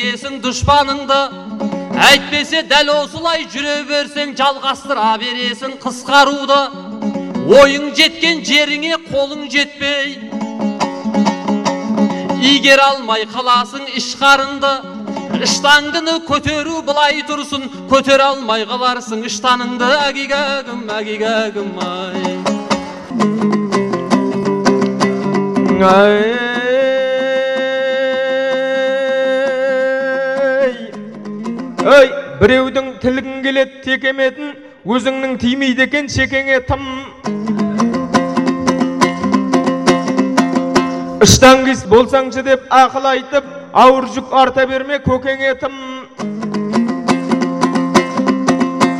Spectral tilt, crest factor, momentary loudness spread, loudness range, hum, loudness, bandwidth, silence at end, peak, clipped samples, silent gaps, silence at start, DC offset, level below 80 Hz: -4 dB/octave; 14 dB; 11 LU; 5 LU; none; -14 LUFS; 16 kHz; 0 s; 0 dBFS; under 0.1%; none; 0 s; under 0.1%; -42 dBFS